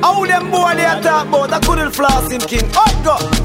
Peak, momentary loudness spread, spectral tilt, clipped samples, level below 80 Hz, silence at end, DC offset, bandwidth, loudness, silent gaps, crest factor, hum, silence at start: -2 dBFS; 3 LU; -4 dB/octave; under 0.1%; -24 dBFS; 0 s; under 0.1%; 16.5 kHz; -14 LUFS; none; 12 dB; none; 0 s